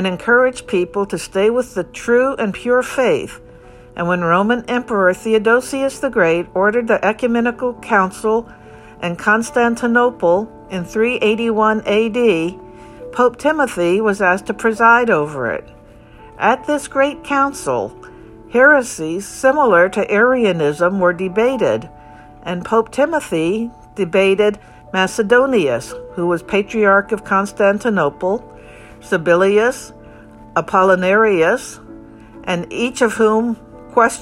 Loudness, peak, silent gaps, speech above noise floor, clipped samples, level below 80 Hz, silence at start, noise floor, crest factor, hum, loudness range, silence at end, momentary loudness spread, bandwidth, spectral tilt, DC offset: -16 LUFS; 0 dBFS; none; 26 dB; under 0.1%; -48 dBFS; 0 s; -41 dBFS; 16 dB; none; 3 LU; 0 s; 11 LU; 15 kHz; -5 dB/octave; under 0.1%